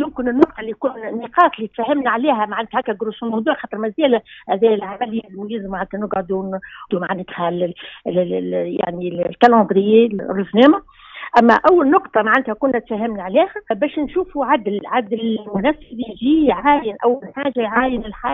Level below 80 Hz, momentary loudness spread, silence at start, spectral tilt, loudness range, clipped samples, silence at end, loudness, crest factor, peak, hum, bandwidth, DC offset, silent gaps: -48 dBFS; 12 LU; 0 s; -4 dB/octave; 8 LU; under 0.1%; 0 s; -18 LUFS; 18 dB; 0 dBFS; none; 7.2 kHz; under 0.1%; none